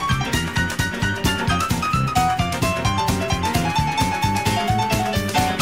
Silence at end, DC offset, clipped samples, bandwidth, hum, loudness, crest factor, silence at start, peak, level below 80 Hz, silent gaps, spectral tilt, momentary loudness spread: 0 s; 0.4%; under 0.1%; 16.5 kHz; none; -20 LUFS; 16 dB; 0 s; -4 dBFS; -34 dBFS; none; -4.5 dB/octave; 2 LU